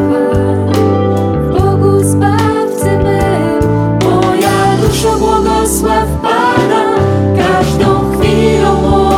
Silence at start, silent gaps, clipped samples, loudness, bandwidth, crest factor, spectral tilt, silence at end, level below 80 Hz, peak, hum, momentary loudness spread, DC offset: 0 s; none; under 0.1%; -11 LUFS; 16.5 kHz; 10 dB; -6 dB/octave; 0 s; -24 dBFS; 0 dBFS; none; 3 LU; under 0.1%